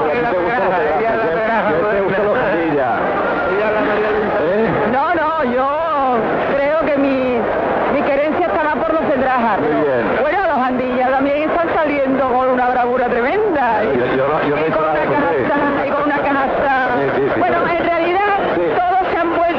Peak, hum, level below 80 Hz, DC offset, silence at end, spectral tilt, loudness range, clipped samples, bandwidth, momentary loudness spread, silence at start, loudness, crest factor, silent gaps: -4 dBFS; none; -44 dBFS; under 0.1%; 0 s; -4 dB/octave; 1 LU; under 0.1%; 6.6 kHz; 1 LU; 0 s; -16 LUFS; 12 dB; none